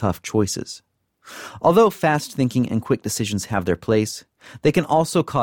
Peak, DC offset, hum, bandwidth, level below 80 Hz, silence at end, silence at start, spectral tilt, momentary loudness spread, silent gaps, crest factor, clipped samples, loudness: -4 dBFS; under 0.1%; none; 18 kHz; -50 dBFS; 0 s; 0 s; -5.5 dB/octave; 19 LU; none; 16 dB; under 0.1%; -21 LUFS